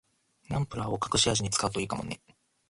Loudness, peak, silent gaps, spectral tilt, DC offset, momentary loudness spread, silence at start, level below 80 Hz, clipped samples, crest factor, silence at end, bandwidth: -29 LUFS; -12 dBFS; none; -3.5 dB/octave; under 0.1%; 12 LU; 0.5 s; -52 dBFS; under 0.1%; 20 dB; 0.55 s; 11.5 kHz